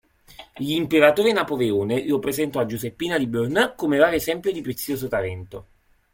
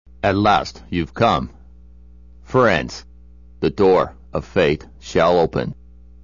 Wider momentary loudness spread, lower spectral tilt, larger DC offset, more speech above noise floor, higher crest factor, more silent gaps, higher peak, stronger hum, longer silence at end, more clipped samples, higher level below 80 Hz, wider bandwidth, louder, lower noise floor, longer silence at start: about the same, 12 LU vs 12 LU; about the same, -5 dB/octave vs -6 dB/octave; second, under 0.1% vs 0.4%; about the same, 25 dB vs 26 dB; about the same, 20 dB vs 16 dB; neither; about the same, -2 dBFS vs -4 dBFS; neither; about the same, 0.5 s vs 0.5 s; neither; second, -54 dBFS vs -40 dBFS; first, 17 kHz vs 7.4 kHz; second, -22 LUFS vs -19 LUFS; about the same, -47 dBFS vs -44 dBFS; first, 0.4 s vs 0.25 s